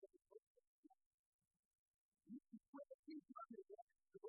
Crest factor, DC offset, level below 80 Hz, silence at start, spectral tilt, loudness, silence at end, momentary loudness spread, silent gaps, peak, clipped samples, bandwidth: 18 dB; under 0.1%; under -90 dBFS; 0 s; 1 dB/octave; -61 LUFS; 0 s; 7 LU; 0.42-0.55 s, 0.67-0.83 s, 1.06-1.39 s, 1.59-1.71 s, 1.78-2.12 s, 2.68-2.73 s, 2.94-3.03 s, 3.82-3.87 s; -44 dBFS; under 0.1%; 1.2 kHz